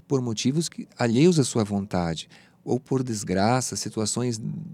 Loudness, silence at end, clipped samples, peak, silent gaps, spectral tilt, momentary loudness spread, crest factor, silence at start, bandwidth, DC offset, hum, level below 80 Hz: -25 LUFS; 0 s; under 0.1%; -6 dBFS; none; -5 dB/octave; 12 LU; 18 dB; 0.1 s; 15.5 kHz; under 0.1%; none; -58 dBFS